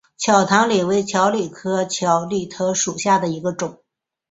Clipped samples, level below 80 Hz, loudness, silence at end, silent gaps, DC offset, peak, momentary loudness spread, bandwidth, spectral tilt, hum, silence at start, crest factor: under 0.1%; -60 dBFS; -19 LUFS; 0.55 s; none; under 0.1%; -2 dBFS; 9 LU; 8 kHz; -4 dB/octave; none; 0.2 s; 18 dB